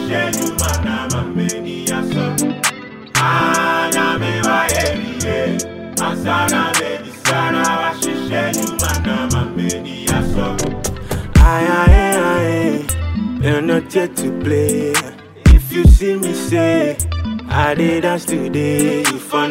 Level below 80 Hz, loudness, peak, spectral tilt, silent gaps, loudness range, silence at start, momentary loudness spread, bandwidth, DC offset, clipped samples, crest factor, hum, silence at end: -20 dBFS; -16 LUFS; 0 dBFS; -4.5 dB/octave; none; 3 LU; 0 s; 9 LU; 16.5 kHz; under 0.1%; under 0.1%; 16 dB; none; 0 s